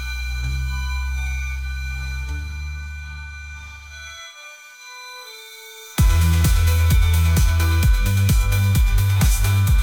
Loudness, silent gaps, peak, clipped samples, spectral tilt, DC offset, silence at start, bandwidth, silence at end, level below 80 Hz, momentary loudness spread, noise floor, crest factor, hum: -20 LUFS; none; -6 dBFS; under 0.1%; -4.5 dB/octave; under 0.1%; 0 s; 19.5 kHz; 0 s; -22 dBFS; 19 LU; -41 dBFS; 14 dB; none